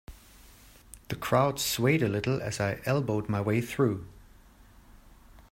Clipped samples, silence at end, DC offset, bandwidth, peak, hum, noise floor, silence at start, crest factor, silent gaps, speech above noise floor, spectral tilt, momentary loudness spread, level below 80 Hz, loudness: under 0.1%; 0.4 s; under 0.1%; 16 kHz; -10 dBFS; none; -55 dBFS; 0.1 s; 20 dB; none; 27 dB; -5.5 dB/octave; 10 LU; -54 dBFS; -28 LUFS